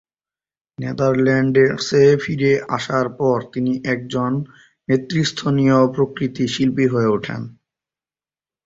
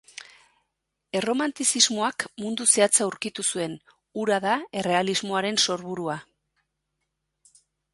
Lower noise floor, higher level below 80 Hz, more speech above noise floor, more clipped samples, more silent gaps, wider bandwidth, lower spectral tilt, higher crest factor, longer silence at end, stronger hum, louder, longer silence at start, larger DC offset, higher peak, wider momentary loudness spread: first, under -90 dBFS vs -80 dBFS; first, -54 dBFS vs -72 dBFS; first, over 72 dB vs 55 dB; neither; neither; second, 7.8 kHz vs 12 kHz; first, -6.5 dB/octave vs -2 dB/octave; second, 16 dB vs 24 dB; second, 1.15 s vs 1.7 s; neither; first, -18 LUFS vs -24 LUFS; second, 0.8 s vs 1.15 s; neither; about the same, -2 dBFS vs -2 dBFS; second, 11 LU vs 14 LU